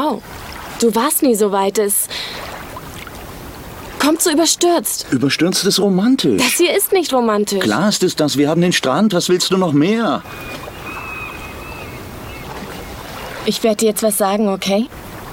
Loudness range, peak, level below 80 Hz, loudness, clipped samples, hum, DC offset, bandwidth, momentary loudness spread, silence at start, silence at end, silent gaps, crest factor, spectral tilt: 8 LU; -2 dBFS; -44 dBFS; -15 LUFS; under 0.1%; none; under 0.1%; 18 kHz; 17 LU; 0 s; 0 s; none; 16 dB; -4 dB/octave